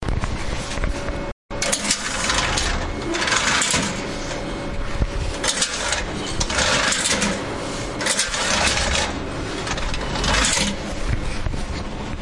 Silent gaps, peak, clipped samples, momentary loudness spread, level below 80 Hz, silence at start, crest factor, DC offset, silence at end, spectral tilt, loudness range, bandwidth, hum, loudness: 1.32-1.49 s; -2 dBFS; under 0.1%; 10 LU; -30 dBFS; 0 s; 20 dB; under 0.1%; 0 s; -2.5 dB/octave; 3 LU; 11.5 kHz; none; -22 LUFS